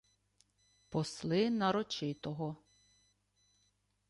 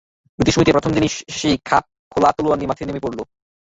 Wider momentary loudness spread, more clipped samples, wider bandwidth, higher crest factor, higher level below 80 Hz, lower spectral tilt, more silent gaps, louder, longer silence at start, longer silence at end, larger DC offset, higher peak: about the same, 10 LU vs 11 LU; neither; first, 11.5 kHz vs 8 kHz; about the same, 20 dB vs 18 dB; second, -72 dBFS vs -42 dBFS; about the same, -5.5 dB/octave vs -5 dB/octave; second, none vs 1.99-2.11 s; second, -36 LUFS vs -19 LUFS; first, 0.9 s vs 0.4 s; first, 1.55 s vs 0.4 s; neither; second, -20 dBFS vs -2 dBFS